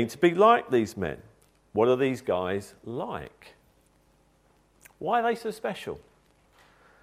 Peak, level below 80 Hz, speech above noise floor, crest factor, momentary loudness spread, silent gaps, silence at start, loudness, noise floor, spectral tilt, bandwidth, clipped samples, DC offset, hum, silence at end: -6 dBFS; -62 dBFS; 38 dB; 22 dB; 18 LU; none; 0 s; -26 LUFS; -64 dBFS; -6 dB/octave; 15.5 kHz; under 0.1%; under 0.1%; none; 1.05 s